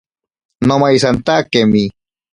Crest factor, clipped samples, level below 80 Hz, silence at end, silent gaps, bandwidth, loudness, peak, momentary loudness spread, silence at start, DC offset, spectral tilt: 14 dB; under 0.1%; -44 dBFS; 0.45 s; none; 11 kHz; -13 LUFS; 0 dBFS; 6 LU; 0.6 s; under 0.1%; -5.5 dB/octave